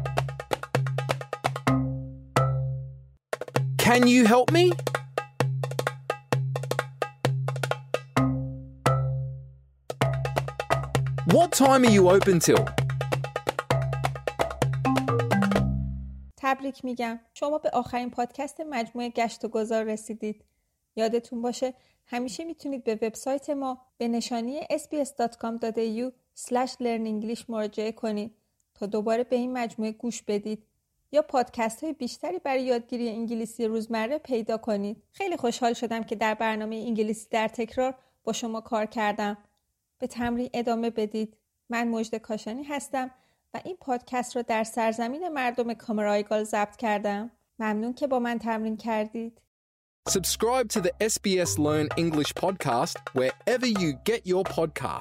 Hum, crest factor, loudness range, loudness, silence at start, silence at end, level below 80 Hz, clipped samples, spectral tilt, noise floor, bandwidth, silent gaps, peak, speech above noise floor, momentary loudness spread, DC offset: none; 22 dB; 8 LU; -27 LUFS; 0 s; 0 s; -50 dBFS; under 0.1%; -5.5 dB/octave; -76 dBFS; 16.5 kHz; 49.47-50.03 s; -6 dBFS; 50 dB; 10 LU; under 0.1%